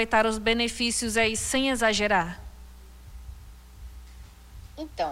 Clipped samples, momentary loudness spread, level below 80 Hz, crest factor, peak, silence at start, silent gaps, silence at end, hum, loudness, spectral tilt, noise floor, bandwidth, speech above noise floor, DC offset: under 0.1%; 23 LU; -44 dBFS; 18 dB; -10 dBFS; 0 s; none; 0 s; none; -24 LUFS; -2.5 dB/octave; -46 dBFS; 16 kHz; 21 dB; under 0.1%